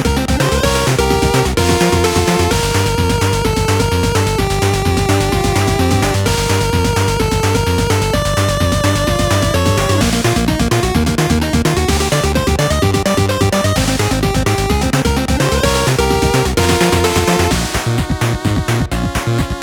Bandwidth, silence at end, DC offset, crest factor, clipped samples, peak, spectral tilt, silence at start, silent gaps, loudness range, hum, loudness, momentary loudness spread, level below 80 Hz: 20 kHz; 0 s; under 0.1%; 12 dB; under 0.1%; 0 dBFS; -5 dB/octave; 0 s; none; 1 LU; none; -14 LUFS; 2 LU; -24 dBFS